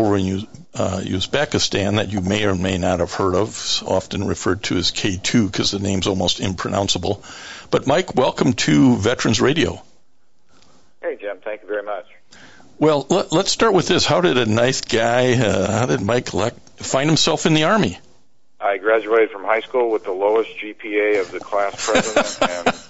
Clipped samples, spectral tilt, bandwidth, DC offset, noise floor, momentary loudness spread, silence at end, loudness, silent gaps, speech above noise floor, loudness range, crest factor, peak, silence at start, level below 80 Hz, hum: under 0.1%; -4.5 dB/octave; 8.2 kHz; under 0.1%; -66 dBFS; 11 LU; 0 s; -19 LUFS; none; 47 dB; 4 LU; 16 dB; -2 dBFS; 0 s; -48 dBFS; none